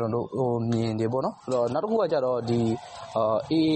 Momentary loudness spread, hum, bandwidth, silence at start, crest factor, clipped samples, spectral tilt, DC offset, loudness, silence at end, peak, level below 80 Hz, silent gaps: 4 LU; none; 8.4 kHz; 0 s; 12 dB; under 0.1%; -7.5 dB/octave; under 0.1%; -26 LUFS; 0 s; -14 dBFS; -60 dBFS; none